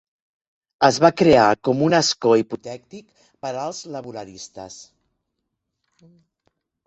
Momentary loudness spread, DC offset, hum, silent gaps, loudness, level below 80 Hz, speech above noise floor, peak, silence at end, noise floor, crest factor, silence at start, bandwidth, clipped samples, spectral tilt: 22 LU; under 0.1%; none; none; -18 LUFS; -58 dBFS; 59 dB; -2 dBFS; 2.05 s; -78 dBFS; 20 dB; 0.8 s; 8.4 kHz; under 0.1%; -4.5 dB/octave